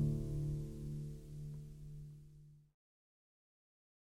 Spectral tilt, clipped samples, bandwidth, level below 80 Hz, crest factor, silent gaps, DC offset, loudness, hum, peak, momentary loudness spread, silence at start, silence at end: -9 dB/octave; under 0.1%; 12.5 kHz; -54 dBFS; 18 dB; none; under 0.1%; -45 LUFS; none; -26 dBFS; 19 LU; 0 s; 1.5 s